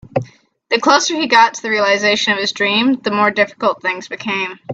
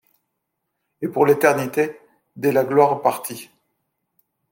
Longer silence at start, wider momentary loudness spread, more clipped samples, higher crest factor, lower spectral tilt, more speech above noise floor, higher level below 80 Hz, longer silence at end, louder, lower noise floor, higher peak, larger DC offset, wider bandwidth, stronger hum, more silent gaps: second, 0.15 s vs 1 s; second, 9 LU vs 14 LU; neither; about the same, 16 dB vs 20 dB; second, -3 dB/octave vs -5.5 dB/octave; second, 23 dB vs 59 dB; first, -60 dBFS vs -70 dBFS; second, 0 s vs 1.05 s; first, -15 LUFS vs -19 LUFS; second, -39 dBFS vs -77 dBFS; about the same, 0 dBFS vs -2 dBFS; neither; second, 8.4 kHz vs 17 kHz; neither; neither